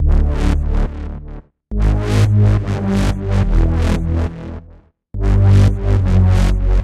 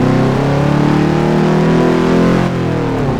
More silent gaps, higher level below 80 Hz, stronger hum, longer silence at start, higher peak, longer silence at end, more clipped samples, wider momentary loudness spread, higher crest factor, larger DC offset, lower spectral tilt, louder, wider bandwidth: neither; first, -18 dBFS vs -30 dBFS; neither; about the same, 0 s vs 0 s; about the same, -2 dBFS vs -2 dBFS; about the same, 0 s vs 0 s; neither; first, 17 LU vs 4 LU; about the same, 12 dB vs 10 dB; neither; about the same, -8 dB/octave vs -7.5 dB/octave; second, -16 LUFS vs -12 LUFS; about the same, 10.5 kHz vs 11.5 kHz